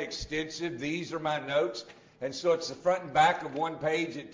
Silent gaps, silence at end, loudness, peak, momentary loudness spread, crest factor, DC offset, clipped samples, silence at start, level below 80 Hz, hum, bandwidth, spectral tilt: none; 0 s; -30 LUFS; -12 dBFS; 10 LU; 20 dB; under 0.1%; under 0.1%; 0 s; -58 dBFS; none; 7.6 kHz; -4 dB/octave